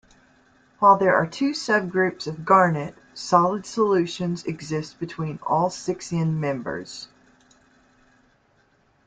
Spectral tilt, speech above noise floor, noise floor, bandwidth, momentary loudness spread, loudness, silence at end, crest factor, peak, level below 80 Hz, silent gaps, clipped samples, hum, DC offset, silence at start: -5.5 dB/octave; 40 dB; -62 dBFS; 9.2 kHz; 15 LU; -23 LUFS; 2 s; 20 dB; -4 dBFS; -62 dBFS; none; under 0.1%; none; under 0.1%; 0.8 s